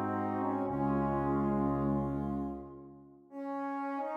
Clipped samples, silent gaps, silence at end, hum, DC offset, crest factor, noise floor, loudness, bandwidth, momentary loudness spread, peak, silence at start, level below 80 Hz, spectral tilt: under 0.1%; none; 0 s; none; under 0.1%; 14 dB; -54 dBFS; -34 LUFS; 5 kHz; 15 LU; -20 dBFS; 0 s; -52 dBFS; -10.5 dB/octave